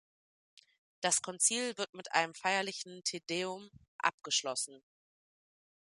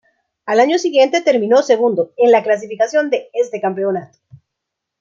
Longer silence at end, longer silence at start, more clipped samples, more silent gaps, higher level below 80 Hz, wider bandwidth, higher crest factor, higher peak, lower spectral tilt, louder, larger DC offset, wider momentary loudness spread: about the same, 1.05 s vs 0.95 s; first, 1 s vs 0.45 s; neither; first, 1.89-1.93 s, 3.88-3.99 s, 4.14-4.18 s vs none; second, -82 dBFS vs -70 dBFS; first, 11.5 kHz vs 7.6 kHz; first, 26 dB vs 14 dB; second, -10 dBFS vs -2 dBFS; second, -1 dB/octave vs -4.5 dB/octave; second, -34 LUFS vs -15 LUFS; neither; about the same, 10 LU vs 8 LU